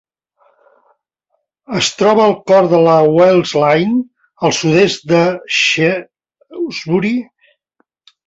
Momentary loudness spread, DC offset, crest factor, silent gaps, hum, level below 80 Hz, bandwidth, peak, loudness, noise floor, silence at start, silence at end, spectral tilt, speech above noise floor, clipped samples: 13 LU; under 0.1%; 14 dB; none; none; -56 dBFS; 8 kHz; 0 dBFS; -13 LUFS; -69 dBFS; 1.7 s; 1.05 s; -5 dB/octave; 57 dB; under 0.1%